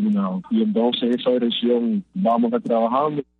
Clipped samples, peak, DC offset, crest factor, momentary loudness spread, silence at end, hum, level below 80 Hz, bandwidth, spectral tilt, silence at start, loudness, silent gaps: under 0.1%; -8 dBFS; under 0.1%; 14 dB; 3 LU; 0.2 s; none; -68 dBFS; 4.5 kHz; -8.5 dB/octave; 0 s; -21 LUFS; none